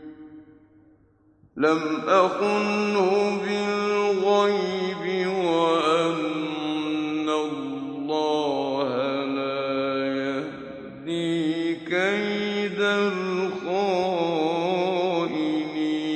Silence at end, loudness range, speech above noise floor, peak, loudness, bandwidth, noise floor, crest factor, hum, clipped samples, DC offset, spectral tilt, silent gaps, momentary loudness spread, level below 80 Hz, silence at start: 0 s; 4 LU; 37 dB; -6 dBFS; -24 LUFS; 9.2 kHz; -59 dBFS; 18 dB; none; under 0.1%; under 0.1%; -5.5 dB/octave; none; 7 LU; -68 dBFS; 0 s